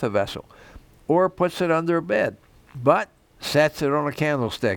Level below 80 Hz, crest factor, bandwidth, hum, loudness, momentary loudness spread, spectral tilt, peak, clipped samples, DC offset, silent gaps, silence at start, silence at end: -54 dBFS; 20 dB; 19.5 kHz; none; -22 LUFS; 13 LU; -6 dB/octave; -2 dBFS; under 0.1%; under 0.1%; none; 0 s; 0 s